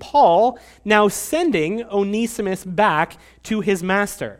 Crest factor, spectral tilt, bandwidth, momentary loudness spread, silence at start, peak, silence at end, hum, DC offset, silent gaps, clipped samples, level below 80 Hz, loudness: 18 dB; -4.5 dB/octave; 16.5 kHz; 10 LU; 0 s; 0 dBFS; 0.05 s; none; under 0.1%; none; under 0.1%; -50 dBFS; -19 LUFS